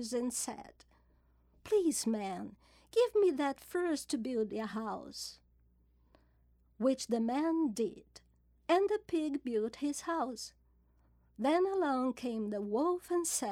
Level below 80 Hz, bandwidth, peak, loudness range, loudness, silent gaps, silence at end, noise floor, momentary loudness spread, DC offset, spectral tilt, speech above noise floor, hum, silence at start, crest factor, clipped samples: -68 dBFS; 17 kHz; -18 dBFS; 4 LU; -34 LUFS; none; 0 s; -69 dBFS; 11 LU; under 0.1%; -4 dB/octave; 35 dB; none; 0 s; 18 dB; under 0.1%